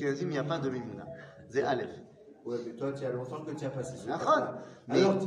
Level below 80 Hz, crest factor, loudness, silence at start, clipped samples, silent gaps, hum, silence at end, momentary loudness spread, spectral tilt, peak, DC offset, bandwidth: -70 dBFS; 20 dB; -33 LUFS; 0 s; under 0.1%; none; none; 0 s; 17 LU; -6 dB/octave; -12 dBFS; under 0.1%; 10.5 kHz